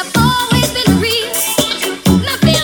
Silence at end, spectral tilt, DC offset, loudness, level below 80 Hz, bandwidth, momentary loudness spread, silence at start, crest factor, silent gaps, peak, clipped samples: 0 s; -4 dB/octave; under 0.1%; -13 LUFS; -32 dBFS; over 20 kHz; 2 LU; 0 s; 14 dB; none; 0 dBFS; under 0.1%